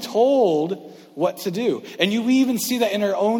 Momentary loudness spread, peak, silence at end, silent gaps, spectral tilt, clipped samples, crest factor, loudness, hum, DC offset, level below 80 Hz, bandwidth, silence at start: 8 LU; -2 dBFS; 0 s; none; -4.5 dB/octave; under 0.1%; 18 dB; -21 LUFS; none; under 0.1%; -68 dBFS; 19 kHz; 0 s